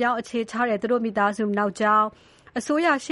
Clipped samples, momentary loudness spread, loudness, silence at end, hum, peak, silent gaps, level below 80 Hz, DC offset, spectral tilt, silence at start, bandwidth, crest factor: under 0.1%; 8 LU; -23 LUFS; 0 s; none; -8 dBFS; none; -64 dBFS; under 0.1%; -5 dB/octave; 0 s; 11.5 kHz; 16 dB